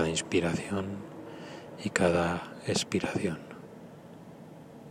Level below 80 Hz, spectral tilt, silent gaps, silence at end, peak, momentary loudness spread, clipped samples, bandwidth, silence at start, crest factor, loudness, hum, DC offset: -58 dBFS; -4.5 dB/octave; none; 0 s; -8 dBFS; 22 LU; under 0.1%; 15.5 kHz; 0 s; 24 dB; -31 LUFS; none; under 0.1%